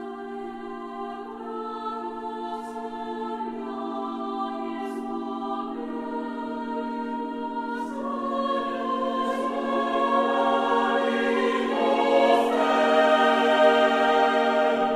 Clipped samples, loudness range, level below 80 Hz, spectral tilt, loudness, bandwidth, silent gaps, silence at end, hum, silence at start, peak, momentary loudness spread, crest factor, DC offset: under 0.1%; 12 LU; -64 dBFS; -4 dB/octave; -25 LUFS; 13.5 kHz; none; 0 s; none; 0 s; -6 dBFS; 14 LU; 18 dB; under 0.1%